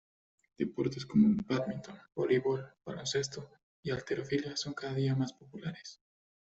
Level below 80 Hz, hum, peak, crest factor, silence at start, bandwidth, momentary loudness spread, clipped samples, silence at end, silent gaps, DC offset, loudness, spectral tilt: -68 dBFS; none; -16 dBFS; 20 dB; 0.6 s; 8.2 kHz; 16 LU; under 0.1%; 0.6 s; 3.63-3.83 s; under 0.1%; -34 LUFS; -6 dB/octave